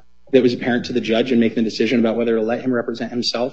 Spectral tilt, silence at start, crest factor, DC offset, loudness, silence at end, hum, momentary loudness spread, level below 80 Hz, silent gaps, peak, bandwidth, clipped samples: -5.5 dB/octave; 0.3 s; 18 dB; 0.7%; -19 LUFS; 0 s; none; 5 LU; -58 dBFS; none; 0 dBFS; 8 kHz; under 0.1%